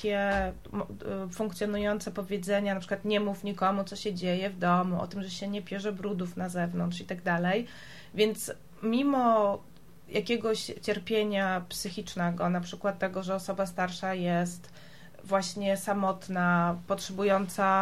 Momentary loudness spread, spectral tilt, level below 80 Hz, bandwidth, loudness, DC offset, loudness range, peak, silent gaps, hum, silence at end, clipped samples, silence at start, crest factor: 9 LU; -5.5 dB/octave; -56 dBFS; 15 kHz; -30 LUFS; 0.3%; 3 LU; -14 dBFS; none; none; 0 s; under 0.1%; 0 s; 16 dB